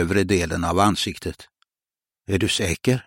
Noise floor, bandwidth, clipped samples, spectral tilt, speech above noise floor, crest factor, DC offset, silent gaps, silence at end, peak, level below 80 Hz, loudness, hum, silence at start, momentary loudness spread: under -90 dBFS; 16.5 kHz; under 0.1%; -4.5 dB/octave; over 68 dB; 20 dB; under 0.1%; none; 0.05 s; -4 dBFS; -42 dBFS; -22 LUFS; none; 0 s; 13 LU